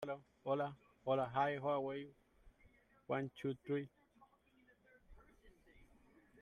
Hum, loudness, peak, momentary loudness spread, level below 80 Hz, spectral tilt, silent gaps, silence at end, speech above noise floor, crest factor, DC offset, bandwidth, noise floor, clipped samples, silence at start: none; -42 LUFS; -24 dBFS; 11 LU; -72 dBFS; -7.5 dB/octave; none; 0.6 s; 32 dB; 20 dB; under 0.1%; 11.5 kHz; -72 dBFS; under 0.1%; 0 s